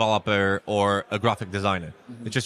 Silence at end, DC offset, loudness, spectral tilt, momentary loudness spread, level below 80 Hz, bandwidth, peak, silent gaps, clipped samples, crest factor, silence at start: 0 s; under 0.1%; -24 LUFS; -5 dB/octave; 8 LU; -58 dBFS; 12.5 kHz; -8 dBFS; none; under 0.1%; 16 dB; 0 s